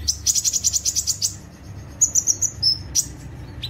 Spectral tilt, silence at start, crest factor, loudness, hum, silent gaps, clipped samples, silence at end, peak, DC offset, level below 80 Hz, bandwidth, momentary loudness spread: 0 dB/octave; 0 s; 20 dB; -19 LUFS; none; none; under 0.1%; 0 s; -4 dBFS; under 0.1%; -42 dBFS; 16.5 kHz; 21 LU